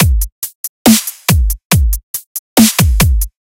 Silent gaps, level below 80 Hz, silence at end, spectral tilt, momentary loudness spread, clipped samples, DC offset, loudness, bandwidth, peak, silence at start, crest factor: 0.32-0.42 s, 0.55-0.85 s, 1.65-1.70 s, 2.03-2.14 s, 2.26-2.56 s; -16 dBFS; 0.25 s; -4 dB/octave; 13 LU; 0.3%; under 0.1%; -13 LUFS; over 20 kHz; 0 dBFS; 0 s; 12 dB